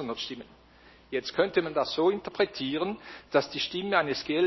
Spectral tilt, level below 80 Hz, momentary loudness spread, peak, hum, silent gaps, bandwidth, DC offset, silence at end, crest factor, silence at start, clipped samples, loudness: -5 dB/octave; -62 dBFS; 9 LU; -8 dBFS; none; none; 6.2 kHz; under 0.1%; 0 s; 20 dB; 0 s; under 0.1%; -29 LUFS